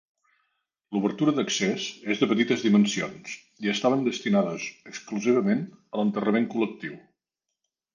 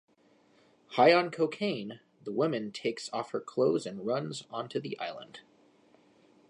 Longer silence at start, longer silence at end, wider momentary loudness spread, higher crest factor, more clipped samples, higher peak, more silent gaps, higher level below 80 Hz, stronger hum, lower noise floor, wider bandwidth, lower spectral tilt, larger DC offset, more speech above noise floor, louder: about the same, 0.9 s vs 0.9 s; second, 0.95 s vs 1.1 s; second, 13 LU vs 17 LU; about the same, 18 dB vs 22 dB; neither; about the same, -8 dBFS vs -10 dBFS; neither; first, -72 dBFS vs -84 dBFS; neither; first, -85 dBFS vs -65 dBFS; second, 9.8 kHz vs 11 kHz; about the same, -5 dB/octave vs -5.5 dB/octave; neither; first, 60 dB vs 35 dB; first, -26 LUFS vs -31 LUFS